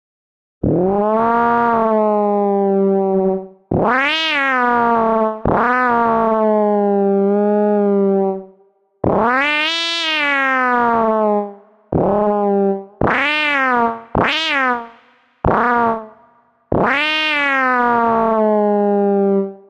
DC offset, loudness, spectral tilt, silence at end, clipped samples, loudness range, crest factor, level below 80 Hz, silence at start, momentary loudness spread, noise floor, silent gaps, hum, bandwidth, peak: under 0.1%; -16 LUFS; -6 dB/octave; 0.15 s; under 0.1%; 2 LU; 16 dB; -42 dBFS; 0.65 s; 5 LU; -55 dBFS; none; none; 9.2 kHz; 0 dBFS